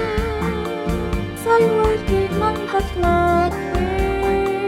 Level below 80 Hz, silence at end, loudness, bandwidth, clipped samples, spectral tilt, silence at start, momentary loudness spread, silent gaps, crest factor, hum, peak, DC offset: -28 dBFS; 0 s; -19 LUFS; 16 kHz; under 0.1%; -6.5 dB/octave; 0 s; 7 LU; none; 14 dB; none; -4 dBFS; under 0.1%